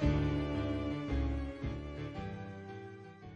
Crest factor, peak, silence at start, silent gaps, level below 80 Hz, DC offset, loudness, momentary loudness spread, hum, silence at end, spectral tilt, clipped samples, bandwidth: 16 dB; -20 dBFS; 0 s; none; -42 dBFS; under 0.1%; -38 LUFS; 14 LU; none; 0 s; -8 dB/octave; under 0.1%; 7.6 kHz